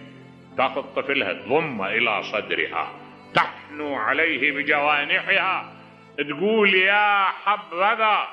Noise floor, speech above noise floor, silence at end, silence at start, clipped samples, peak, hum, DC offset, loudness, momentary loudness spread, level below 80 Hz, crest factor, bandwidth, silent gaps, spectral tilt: -45 dBFS; 23 dB; 0 s; 0 s; under 0.1%; -6 dBFS; none; under 0.1%; -21 LUFS; 12 LU; -72 dBFS; 18 dB; 9 kHz; none; -5.5 dB/octave